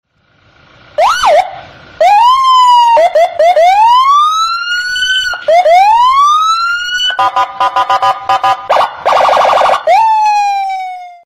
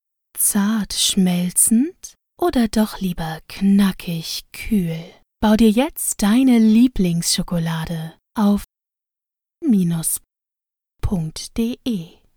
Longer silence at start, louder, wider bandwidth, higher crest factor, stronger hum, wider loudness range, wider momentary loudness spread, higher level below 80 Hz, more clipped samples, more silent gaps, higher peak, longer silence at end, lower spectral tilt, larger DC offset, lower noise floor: first, 1 s vs 0.35 s; first, -8 LUFS vs -19 LUFS; second, 15.5 kHz vs over 20 kHz; second, 8 dB vs 18 dB; neither; second, 3 LU vs 6 LU; second, 7 LU vs 13 LU; second, -48 dBFS vs -38 dBFS; neither; neither; about the same, 0 dBFS vs -2 dBFS; second, 0.1 s vs 0.3 s; second, -0.5 dB/octave vs -4.5 dB/octave; neither; second, -50 dBFS vs -87 dBFS